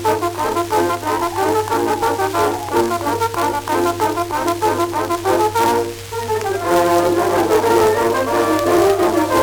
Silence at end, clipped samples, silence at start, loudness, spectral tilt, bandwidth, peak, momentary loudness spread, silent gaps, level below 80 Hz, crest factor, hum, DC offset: 0 s; under 0.1%; 0 s; -17 LUFS; -4.5 dB/octave; over 20 kHz; 0 dBFS; 5 LU; none; -46 dBFS; 16 dB; none; under 0.1%